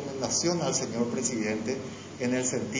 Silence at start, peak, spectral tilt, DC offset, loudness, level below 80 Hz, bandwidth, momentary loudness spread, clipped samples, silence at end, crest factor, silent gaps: 0 s; -14 dBFS; -3.5 dB/octave; under 0.1%; -29 LUFS; -60 dBFS; 7.8 kHz; 8 LU; under 0.1%; 0 s; 16 dB; none